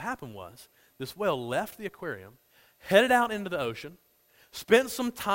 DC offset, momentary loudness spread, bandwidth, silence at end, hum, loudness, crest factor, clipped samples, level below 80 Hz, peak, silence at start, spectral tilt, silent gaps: under 0.1%; 21 LU; 16.5 kHz; 0 s; none; -27 LUFS; 22 dB; under 0.1%; -64 dBFS; -8 dBFS; 0 s; -4 dB/octave; none